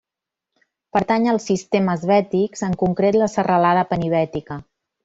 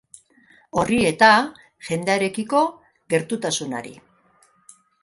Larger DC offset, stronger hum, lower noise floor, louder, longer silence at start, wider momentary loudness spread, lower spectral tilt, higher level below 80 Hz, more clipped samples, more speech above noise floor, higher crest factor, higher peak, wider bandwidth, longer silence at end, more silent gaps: neither; neither; first, -85 dBFS vs -59 dBFS; about the same, -19 LUFS vs -20 LUFS; first, 0.95 s vs 0.75 s; second, 7 LU vs 16 LU; first, -6.5 dB/octave vs -4 dB/octave; about the same, -52 dBFS vs -56 dBFS; neither; first, 67 dB vs 39 dB; second, 16 dB vs 22 dB; second, -4 dBFS vs 0 dBFS; second, 8 kHz vs 11.5 kHz; second, 0.4 s vs 1.1 s; neither